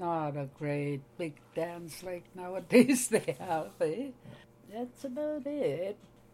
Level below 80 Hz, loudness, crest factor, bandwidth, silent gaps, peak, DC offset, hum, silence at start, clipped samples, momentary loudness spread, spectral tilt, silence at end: -70 dBFS; -33 LUFS; 24 dB; 16 kHz; none; -8 dBFS; under 0.1%; none; 0 s; under 0.1%; 16 LU; -5 dB/octave; 0.35 s